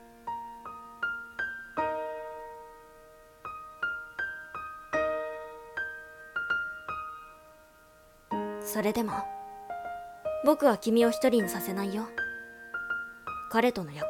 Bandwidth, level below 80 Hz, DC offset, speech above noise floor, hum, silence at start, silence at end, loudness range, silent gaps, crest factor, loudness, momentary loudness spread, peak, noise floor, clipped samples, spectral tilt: 17.5 kHz; -62 dBFS; under 0.1%; 30 dB; none; 0 s; 0 s; 9 LU; none; 22 dB; -32 LUFS; 18 LU; -10 dBFS; -57 dBFS; under 0.1%; -4.5 dB/octave